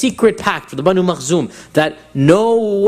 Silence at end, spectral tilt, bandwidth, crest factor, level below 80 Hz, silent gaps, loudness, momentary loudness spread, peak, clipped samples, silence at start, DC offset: 0 s; -5.5 dB/octave; 15 kHz; 14 dB; -50 dBFS; none; -15 LUFS; 7 LU; 0 dBFS; under 0.1%; 0 s; under 0.1%